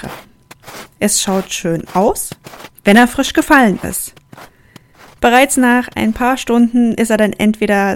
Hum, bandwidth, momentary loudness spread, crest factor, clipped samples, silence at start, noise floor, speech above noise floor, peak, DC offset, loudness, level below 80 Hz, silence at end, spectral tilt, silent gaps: none; 17.5 kHz; 14 LU; 14 dB; 0.3%; 0 s; -44 dBFS; 32 dB; 0 dBFS; under 0.1%; -13 LUFS; -40 dBFS; 0 s; -4 dB/octave; none